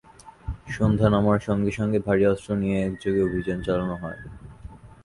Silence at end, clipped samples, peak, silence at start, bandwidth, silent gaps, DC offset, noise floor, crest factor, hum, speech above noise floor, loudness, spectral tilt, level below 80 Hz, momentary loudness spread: 0.1 s; under 0.1%; -6 dBFS; 0.25 s; 11.5 kHz; none; under 0.1%; -44 dBFS; 18 dB; none; 21 dB; -24 LUFS; -8 dB/octave; -42 dBFS; 19 LU